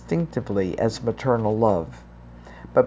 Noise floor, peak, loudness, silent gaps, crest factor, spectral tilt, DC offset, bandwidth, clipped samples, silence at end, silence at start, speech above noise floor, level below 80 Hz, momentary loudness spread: -43 dBFS; -4 dBFS; -24 LUFS; none; 20 dB; -7.5 dB/octave; under 0.1%; 8 kHz; under 0.1%; 0 s; 0 s; 20 dB; -46 dBFS; 21 LU